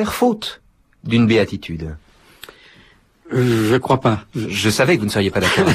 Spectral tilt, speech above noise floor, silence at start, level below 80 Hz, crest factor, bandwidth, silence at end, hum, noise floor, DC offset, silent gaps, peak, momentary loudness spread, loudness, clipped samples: -5.5 dB/octave; 34 dB; 0 s; -44 dBFS; 16 dB; 15.5 kHz; 0 s; none; -51 dBFS; under 0.1%; none; -4 dBFS; 14 LU; -18 LUFS; under 0.1%